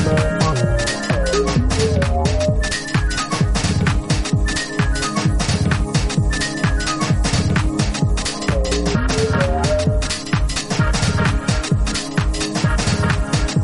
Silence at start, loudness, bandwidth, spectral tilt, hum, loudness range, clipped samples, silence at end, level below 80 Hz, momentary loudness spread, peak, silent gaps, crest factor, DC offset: 0 s; -19 LUFS; 11.5 kHz; -5 dB/octave; none; 1 LU; under 0.1%; 0 s; -24 dBFS; 3 LU; -2 dBFS; none; 14 dB; under 0.1%